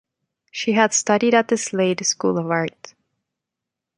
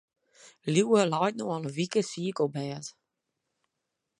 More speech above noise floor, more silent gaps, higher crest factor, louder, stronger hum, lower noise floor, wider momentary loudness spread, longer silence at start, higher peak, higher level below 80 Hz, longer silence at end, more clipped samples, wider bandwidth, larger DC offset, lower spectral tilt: first, 65 dB vs 56 dB; neither; about the same, 20 dB vs 20 dB; first, -19 LUFS vs -28 LUFS; neither; about the same, -85 dBFS vs -84 dBFS; second, 8 LU vs 14 LU; about the same, 0.55 s vs 0.45 s; first, -2 dBFS vs -10 dBFS; first, -68 dBFS vs -76 dBFS; second, 1.1 s vs 1.3 s; neither; about the same, 11 kHz vs 11.5 kHz; neither; second, -3.5 dB/octave vs -5.5 dB/octave